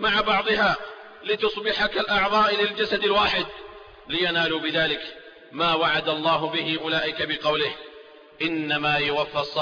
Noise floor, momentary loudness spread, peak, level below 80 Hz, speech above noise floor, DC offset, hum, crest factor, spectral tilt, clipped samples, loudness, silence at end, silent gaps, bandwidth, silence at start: -47 dBFS; 10 LU; -10 dBFS; -52 dBFS; 23 dB; under 0.1%; none; 14 dB; -5 dB/octave; under 0.1%; -23 LUFS; 0 s; none; 5.2 kHz; 0 s